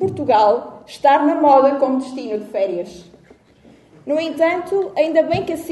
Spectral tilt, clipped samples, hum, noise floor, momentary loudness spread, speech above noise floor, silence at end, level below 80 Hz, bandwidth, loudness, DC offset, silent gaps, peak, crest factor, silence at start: -6 dB/octave; under 0.1%; none; -49 dBFS; 13 LU; 32 dB; 0 s; -56 dBFS; 12 kHz; -17 LUFS; under 0.1%; none; 0 dBFS; 16 dB; 0 s